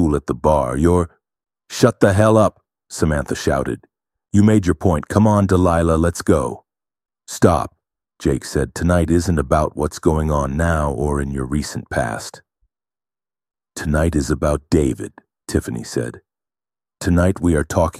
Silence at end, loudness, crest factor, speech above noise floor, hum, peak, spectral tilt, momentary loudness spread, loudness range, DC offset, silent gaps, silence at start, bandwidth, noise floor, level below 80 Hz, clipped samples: 0 s; -18 LUFS; 18 dB; over 73 dB; none; 0 dBFS; -6.5 dB/octave; 13 LU; 6 LU; under 0.1%; none; 0 s; 15 kHz; under -90 dBFS; -32 dBFS; under 0.1%